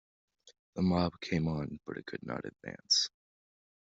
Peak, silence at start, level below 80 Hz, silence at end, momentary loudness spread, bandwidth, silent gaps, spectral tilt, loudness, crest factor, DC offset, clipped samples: -16 dBFS; 0.45 s; -62 dBFS; 0.85 s; 15 LU; 8 kHz; 0.59-0.73 s; -4 dB/octave; -33 LUFS; 20 dB; under 0.1%; under 0.1%